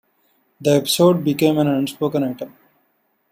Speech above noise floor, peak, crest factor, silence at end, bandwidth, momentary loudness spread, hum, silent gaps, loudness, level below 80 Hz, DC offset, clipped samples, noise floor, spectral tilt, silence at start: 48 dB; -2 dBFS; 18 dB; 0.85 s; 16 kHz; 11 LU; none; none; -18 LUFS; -62 dBFS; under 0.1%; under 0.1%; -66 dBFS; -5.5 dB/octave; 0.6 s